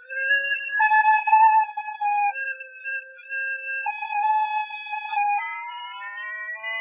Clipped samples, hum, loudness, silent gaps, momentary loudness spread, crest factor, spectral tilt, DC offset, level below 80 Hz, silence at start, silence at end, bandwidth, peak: under 0.1%; none; -23 LUFS; none; 15 LU; 16 dB; 10.5 dB/octave; under 0.1%; under -90 dBFS; 0 s; 0 s; 3.8 kHz; -6 dBFS